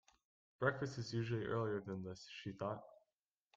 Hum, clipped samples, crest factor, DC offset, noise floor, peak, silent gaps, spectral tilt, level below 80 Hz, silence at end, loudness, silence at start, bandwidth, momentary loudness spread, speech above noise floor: none; under 0.1%; 22 dB; under 0.1%; under -90 dBFS; -22 dBFS; none; -6.5 dB/octave; -74 dBFS; 0.6 s; -43 LUFS; 0.6 s; 7.8 kHz; 11 LU; over 48 dB